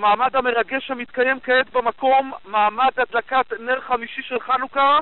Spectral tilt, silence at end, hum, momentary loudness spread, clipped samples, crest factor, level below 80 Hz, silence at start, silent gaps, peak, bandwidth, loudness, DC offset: 0.5 dB/octave; 0 s; none; 7 LU; under 0.1%; 12 dB; -56 dBFS; 0 s; none; -8 dBFS; 4.3 kHz; -20 LUFS; 0.5%